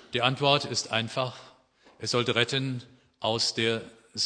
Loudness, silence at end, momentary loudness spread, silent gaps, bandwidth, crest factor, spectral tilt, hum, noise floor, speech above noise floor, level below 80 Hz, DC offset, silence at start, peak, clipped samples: -27 LUFS; 0 s; 12 LU; none; 10.5 kHz; 24 dB; -3.5 dB/octave; none; -59 dBFS; 32 dB; -68 dBFS; under 0.1%; 0.1 s; -6 dBFS; under 0.1%